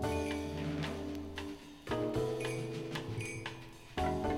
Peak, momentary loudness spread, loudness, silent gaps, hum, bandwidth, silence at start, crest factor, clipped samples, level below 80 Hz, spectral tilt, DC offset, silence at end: -22 dBFS; 9 LU; -39 LUFS; none; none; 17 kHz; 0 s; 16 dB; under 0.1%; -52 dBFS; -6 dB/octave; under 0.1%; 0 s